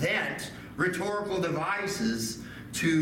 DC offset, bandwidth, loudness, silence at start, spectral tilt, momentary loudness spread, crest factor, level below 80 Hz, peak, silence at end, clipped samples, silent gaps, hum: under 0.1%; 17 kHz; -30 LUFS; 0 s; -4.5 dB/octave; 9 LU; 16 dB; -58 dBFS; -14 dBFS; 0 s; under 0.1%; none; none